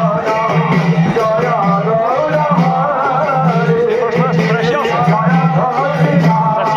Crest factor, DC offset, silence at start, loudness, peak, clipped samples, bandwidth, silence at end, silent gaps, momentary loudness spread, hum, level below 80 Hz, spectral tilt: 12 dB; under 0.1%; 0 s; -13 LUFS; 0 dBFS; under 0.1%; 7.2 kHz; 0 s; none; 2 LU; none; -48 dBFS; -8 dB/octave